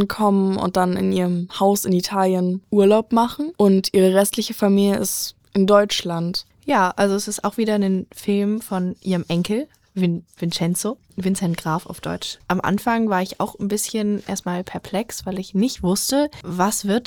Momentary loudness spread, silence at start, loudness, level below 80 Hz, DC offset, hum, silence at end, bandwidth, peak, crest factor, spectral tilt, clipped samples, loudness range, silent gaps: 10 LU; 0 s; -20 LUFS; -52 dBFS; 0.1%; none; 0.05 s; 20 kHz; -2 dBFS; 18 dB; -5 dB/octave; under 0.1%; 5 LU; none